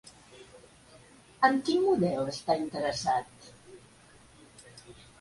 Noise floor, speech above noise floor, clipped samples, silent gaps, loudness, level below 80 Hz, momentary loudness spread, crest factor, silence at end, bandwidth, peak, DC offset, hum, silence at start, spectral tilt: -57 dBFS; 29 dB; under 0.1%; none; -28 LUFS; -64 dBFS; 25 LU; 22 dB; 0.3 s; 11.5 kHz; -10 dBFS; under 0.1%; none; 0.35 s; -5 dB/octave